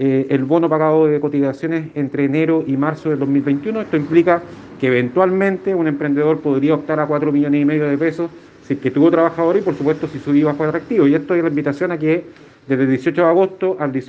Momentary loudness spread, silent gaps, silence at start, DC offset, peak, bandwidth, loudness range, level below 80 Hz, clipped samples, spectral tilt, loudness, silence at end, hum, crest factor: 6 LU; none; 0 s; under 0.1%; 0 dBFS; 7.2 kHz; 1 LU; -60 dBFS; under 0.1%; -9 dB/octave; -17 LUFS; 0.05 s; none; 16 dB